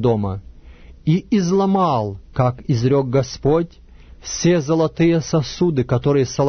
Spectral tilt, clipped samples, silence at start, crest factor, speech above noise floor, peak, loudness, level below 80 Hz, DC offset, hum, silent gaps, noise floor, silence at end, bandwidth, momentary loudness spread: -6.5 dB/octave; under 0.1%; 0 s; 14 dB; 24 dB; -4 dBFS; -19 LUFS; -42 dBFS; under 0.1%; none; none; -41 dBFS; 0 s; 6.6 kHz; 10 LU